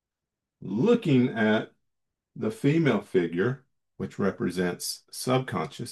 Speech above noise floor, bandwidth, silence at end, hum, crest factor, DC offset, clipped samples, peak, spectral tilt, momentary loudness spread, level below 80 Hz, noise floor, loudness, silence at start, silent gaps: 62 dB; 12.5 kHz; 0 s; none; 16 dB; under 0.1%; under 0.1%; -10 dBFS; -6 dB/octave; 12 LU; -70 dBFS; -88 dBFS; -27 LUFS; 0.6 s; none